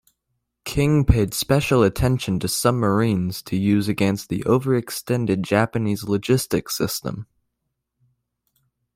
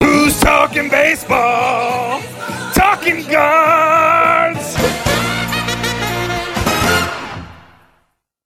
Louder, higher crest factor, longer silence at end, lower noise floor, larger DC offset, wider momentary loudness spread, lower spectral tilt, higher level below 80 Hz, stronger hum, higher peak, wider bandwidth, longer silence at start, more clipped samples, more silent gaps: second, -21 LUFS vs -13 LUFS; first, 20 dB vs 14 dB; first, 1.7 s vs 0.9 s; first, -78 dBFS vs -62 dBFS; neither; second, 7 LU vs 10 LU; first, -6 dB/octave vs -4 dB/octave; about the same, -36 dBFS vs -34 dBFS; neither; about the same, -2 dBFS vs 0 dBFS; about the same, 16.5 kHz vs 16.5 kHz; first, 0.65 s vs 0 s; neither; neither